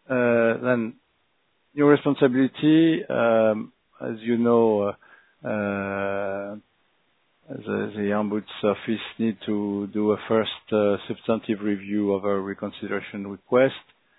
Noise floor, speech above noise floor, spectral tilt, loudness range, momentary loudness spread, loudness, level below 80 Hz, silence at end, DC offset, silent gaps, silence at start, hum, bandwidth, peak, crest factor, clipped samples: -70 dBFS; 46 dB; -10.5 dB/octave; 7 LU; 15 LU; -24 LUFS; -68 dBFS; 0.4 s; under 0.1%; none; 0.1 s; none; 4.1 kHz; -4 dBFS; 20 dB; under 0.1%